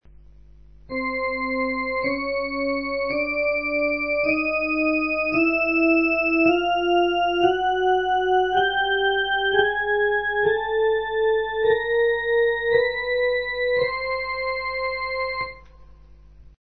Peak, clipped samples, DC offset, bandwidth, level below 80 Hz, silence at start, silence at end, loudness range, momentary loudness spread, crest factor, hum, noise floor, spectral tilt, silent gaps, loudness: -6 dBFS; under 0.1%; 0.2%; 6.2 kHz; -48 dBFS; 0.9 s; 1 s; 5 LU; 6 LU; 16 dB; 50 Hz at -50 dBFS; -48 dBFS; -6 dB/octave; none; -22 LUFS